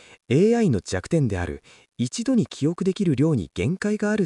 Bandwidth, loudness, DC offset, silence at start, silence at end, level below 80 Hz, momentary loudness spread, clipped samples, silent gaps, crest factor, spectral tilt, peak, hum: 11.5 kHz; -23 LUFS; under 0.1%; 0.3 s; 0 s; -48 dBFS; 10 LU; under 0.1%; none; 14 dB; -6.5 dB/octave; -8 dBFS; none